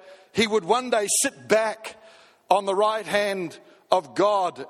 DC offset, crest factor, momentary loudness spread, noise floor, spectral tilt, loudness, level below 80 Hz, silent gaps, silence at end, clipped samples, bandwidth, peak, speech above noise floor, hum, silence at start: under 0.1%; 22 dB; 10 LU; -52 dBFS; -2.5 dB/octave; -23 LUFS; -70 dBFS; none; 0 s; under 0.1%; 16 kHz; -4 dBFS; 29 dB; none; 0.05 s